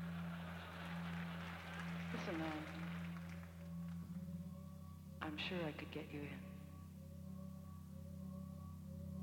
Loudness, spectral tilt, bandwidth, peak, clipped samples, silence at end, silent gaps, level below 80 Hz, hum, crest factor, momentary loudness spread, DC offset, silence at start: -49 LUFS; -6.5 dB/octave; 17 kHz; -30 dBFS; under 0.1%; 0 s; none; -66 dBFS; none; 18 dB; 10 LU; under 0.1%; 0 s